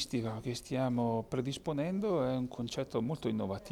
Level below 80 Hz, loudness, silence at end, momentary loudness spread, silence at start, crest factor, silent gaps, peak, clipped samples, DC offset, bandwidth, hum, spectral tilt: -60 dBFS; -35 LUFS; 0 s; 5 LU; 0 s; 14 dB; none; -22 dBFS; under 0.1%; under 0.1%; 15 kHz; none; -6.5 dB/octave